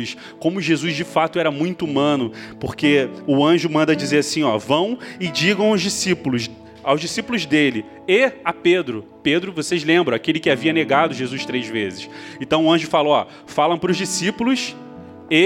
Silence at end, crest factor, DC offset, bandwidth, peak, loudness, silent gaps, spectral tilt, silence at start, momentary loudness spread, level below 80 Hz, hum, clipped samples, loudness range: 0 s; 18 dB; under 0.1%; 16.5 kHz; -2 dBFS; -19 LUFS; none; -4.5 dB/octave; 0 s; 11 LU; -58 dBFS; none; under 0.1%; 2 LU